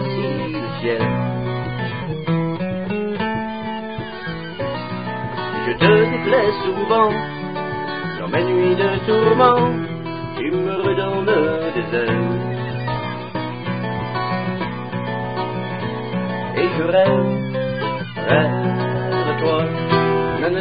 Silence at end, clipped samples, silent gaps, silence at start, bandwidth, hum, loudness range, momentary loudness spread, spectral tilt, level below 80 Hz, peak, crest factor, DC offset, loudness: 0 s; under 0.1%; none; 0 s; 5.2 kHz; none; 6 LU; 10 LU; -11.5 dB/octave; -48 dBFS; 0 dBFS; 20 dB; 0.7%; -20 LUFS